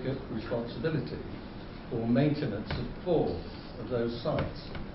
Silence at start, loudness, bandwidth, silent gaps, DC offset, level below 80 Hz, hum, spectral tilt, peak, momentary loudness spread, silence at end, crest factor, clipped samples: 0 s; -33 LUFS; 5.8 kHz; none; under 0.1%; -48 dBFS; none; -11 dB/octave; -16 dBFS; 14 LU; 0 s; 16 dB; under 0.1%